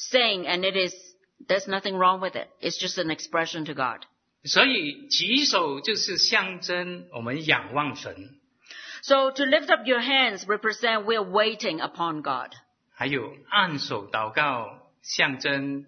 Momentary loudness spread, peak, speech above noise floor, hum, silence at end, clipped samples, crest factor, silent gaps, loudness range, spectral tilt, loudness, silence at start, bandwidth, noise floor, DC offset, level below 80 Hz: 12 LU; -2 dBFS; 20 dB; none; 0.05 s; under 0.1%; 24 dB; none; 4 LU; -2.5 dB/octave; -24 LUFS; 0 s; 6.6 kHz; -46 dBFS; under 0.1%; -74 dBFS